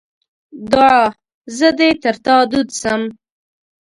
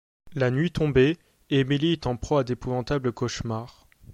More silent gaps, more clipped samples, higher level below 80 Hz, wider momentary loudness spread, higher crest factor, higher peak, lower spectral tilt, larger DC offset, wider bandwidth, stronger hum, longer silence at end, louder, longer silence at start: first, 1.34-1.41 s vs none; neither; about the same, -50 dBFS vs -46 dBFS; about the same, 12 LU vs 12 LU; about the same, 16 dB vs 16 dB; first, 0 dBFS vs -8 dBFS; second, -3.5 dB/octave vs -6.5 dB/octave; neither; about the same, 11.5 kHz vs 11 kHz; neither; first, 0.7 s vs 0.45 s; first, -14 LUFS vs -25 LUFS; first, 0.55 s vs 0.25 s